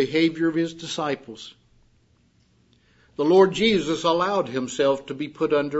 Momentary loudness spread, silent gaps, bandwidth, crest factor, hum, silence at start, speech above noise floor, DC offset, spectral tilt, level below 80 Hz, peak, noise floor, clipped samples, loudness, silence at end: 15 LU; none; 8 kHz; 20 dB; none; 0 s; 39 dB; under 0.1%; -5 dB/octave; -60 dBFS; -4 dBFS; -61 dBFS; under 0.1%; -22 LUFS; 0 s